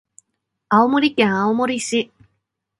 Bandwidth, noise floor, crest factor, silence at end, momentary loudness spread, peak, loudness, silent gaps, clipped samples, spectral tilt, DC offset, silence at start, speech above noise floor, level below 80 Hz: 11.5 kHz; -75 dBFS; 20 dB; 0.75 s; 7 LU; 0 dBFS; -18 LUFS; none; under 0.1%; -4.5 dB/octave; under 0.1%; 0.7 s; 58 dB; -62 dBFS